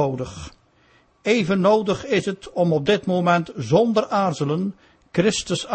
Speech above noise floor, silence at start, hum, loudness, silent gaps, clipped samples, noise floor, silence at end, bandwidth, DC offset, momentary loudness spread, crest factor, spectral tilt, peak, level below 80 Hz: 37 dB; 0 s; none; -21 LUFS; none; under 0.1%; -58 dBFS; 0 s; 8.8 kHz; under 0.1%; 11 LU; 18 dB; -5.5 dB/octave; -4 dBFS; -52 dBFS